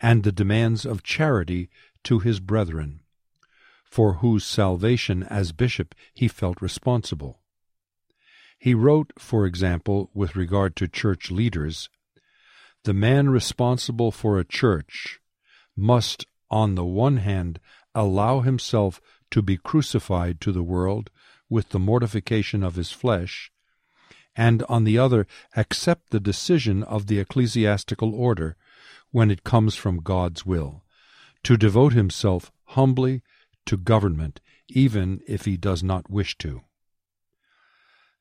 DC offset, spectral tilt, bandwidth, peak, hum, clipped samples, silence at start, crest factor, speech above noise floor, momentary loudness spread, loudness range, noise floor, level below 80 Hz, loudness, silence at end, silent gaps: under 0.1%; -6.5 dB/octave; 12 kHz; -4 dBFS; none; under 0.1%; 0 s; 20 dB; 56 dB; 12 LU; 4 LU; -78 dBFS; -44 dBFS; -23 LUFS; 1.6 s; none